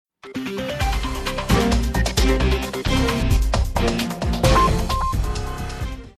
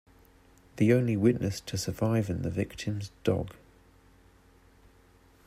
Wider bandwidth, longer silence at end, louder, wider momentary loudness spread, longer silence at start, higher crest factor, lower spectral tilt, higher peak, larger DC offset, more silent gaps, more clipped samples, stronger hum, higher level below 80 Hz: about the same, 14.5 kHz vs 15.5 kHz; second, 0.1 s vs 1.9 s; first, -21 LUFS vs -29 LUFS; about the same, 11 LU vs 10 LU; second, 0.25 s vs 0.75 s; about the same, 16 dB vs 20 dB; second, -5 dB/octave vs -6.5 dB/octave; first, -4 dBFS vs -10 dBFS; neither; neither; neither; neither; first, -24 dBFS vs -56 dBFS